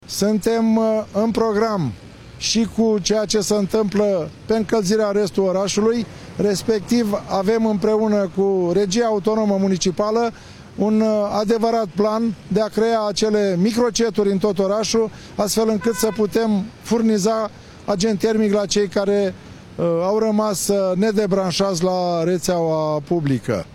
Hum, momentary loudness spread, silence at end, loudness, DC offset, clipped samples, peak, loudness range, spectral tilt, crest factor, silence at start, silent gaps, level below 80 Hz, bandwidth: none; 5 LU; 0 s; -19 LUFS; under 0.1%; under 0.1%; -8 dBFS; 1 LU; -5 dB/octave; 12 dB; 0.1 s; none; -50 dBFS; 16.5 kHz